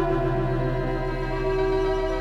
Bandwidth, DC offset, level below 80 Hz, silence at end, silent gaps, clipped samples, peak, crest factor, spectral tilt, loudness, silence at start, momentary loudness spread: 8 kHz; under 0.1%; -32 dBFS; 0 s; none; under 0.1%; -12 dBFS; 12 dB; -8 dB/octave; -25 LUFS; 0 s; 4 LU